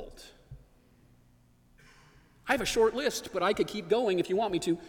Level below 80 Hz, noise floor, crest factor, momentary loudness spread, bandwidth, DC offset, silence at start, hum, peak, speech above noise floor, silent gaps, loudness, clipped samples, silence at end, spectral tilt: -56 dBFS; -62 dBFS; 20 dB; 19 LU; 19 kHz; under 0.1%; 0 s; none; -12 dBFS; 34 dB; none; -29 LUFS; under 0.1%; 0 s; -4 dB/octave